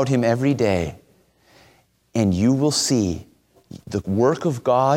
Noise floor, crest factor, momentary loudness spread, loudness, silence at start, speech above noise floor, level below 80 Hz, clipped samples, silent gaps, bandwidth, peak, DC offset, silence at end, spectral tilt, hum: -57 dBFS; 16 dB; 10 LU; -21 LUFS; 0 s; 38 dB; -50 dBFS; under 0.1%; none; 16.5 kHz; -6 dBFS; under 0.1%; 0 s; -5.5 dB/octave; none